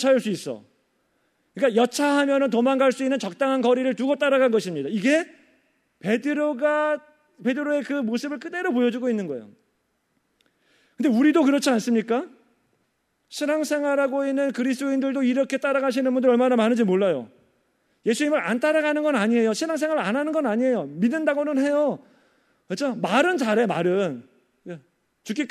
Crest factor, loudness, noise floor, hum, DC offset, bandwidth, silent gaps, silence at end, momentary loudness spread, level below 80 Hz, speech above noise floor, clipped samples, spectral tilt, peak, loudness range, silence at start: 18 dB; -23 LUFS; -71 dBFS; none; under 0.1%; 14 kHz; none; 0.05 s; 10 LU; -80 dBFS; 49 dB; under 0.1%; -5 dB/octave; -6 dBFS; 4 LU; 0 s